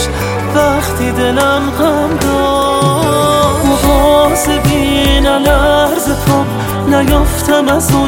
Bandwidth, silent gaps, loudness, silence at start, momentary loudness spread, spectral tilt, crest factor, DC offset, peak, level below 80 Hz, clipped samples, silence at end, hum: 17 kHz; none; -11 LUFS; 0 s; 4 LU; -5 dB/octave; 10 dB; under 0.1%; 0 dBFS; -20 dBFS; under 0.1%; 0 s; none